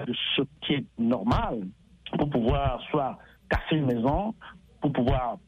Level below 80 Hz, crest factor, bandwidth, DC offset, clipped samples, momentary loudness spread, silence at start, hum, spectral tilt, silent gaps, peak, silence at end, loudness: -38 dBFS; 16 dB; 7.6 kHz; under 0.1%; under 0.1%; 10 LU; 0 s; none; -8 dB/octave; none; -12 dBFS; 0.1 s; -28 LUFS